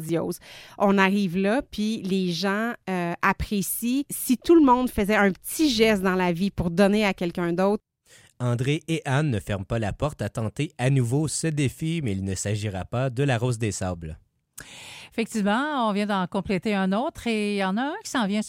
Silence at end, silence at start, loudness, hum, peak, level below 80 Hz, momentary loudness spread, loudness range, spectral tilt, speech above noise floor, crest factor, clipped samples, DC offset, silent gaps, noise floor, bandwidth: 0 s; 0 s; -24 LUFS; none; -6 dBFS; -48 dBFS; 9 LU; 6 LU; -5.5 dB/octave; 32 dB; 18 dB; under 0.1%; under 0.1%; none; -56 dBFS; 16.5 kHz